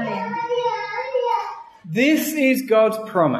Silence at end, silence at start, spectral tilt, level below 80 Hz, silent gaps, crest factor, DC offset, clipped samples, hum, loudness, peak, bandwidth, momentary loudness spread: 0 s; 0 s; -5 dB/octave; -70 dBFS; none; 16 dB; under 0.1%; under 0.1%; none; -20 LUFS; -4 dBFS; 13.5 kHz; 9 LU